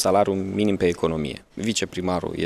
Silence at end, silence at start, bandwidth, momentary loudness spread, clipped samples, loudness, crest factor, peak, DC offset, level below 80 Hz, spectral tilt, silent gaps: 0 s; 0 s; 15 kHz; 8 LU; under 0.1%; -24 LUFS; 18 dB; -6 dBFS; under 0.1%; -48 dBFS; -5 dB/octave; none